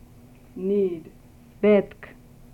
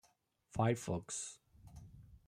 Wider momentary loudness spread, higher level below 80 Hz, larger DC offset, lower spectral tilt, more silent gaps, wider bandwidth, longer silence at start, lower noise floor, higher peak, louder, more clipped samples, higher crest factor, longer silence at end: about the same, 24 LU vs 23 LU; first, -54 dBFS vs -64 dBFS; neither; first, -8.5 dB/octave vs -5.5 dB/octave; neither; second, 4.7 kHz vs 15 kHz; about the same, 0.55 s vs 0.55 s; second, -49 dBFS vs -76 dBFS; first, -8 dBFS vs -22 dBFS; first, -23 LUFS vs -39 LUFS; neither; about the same, 18 dB vs 20 dB; first, 0.45 s vs 0.1 s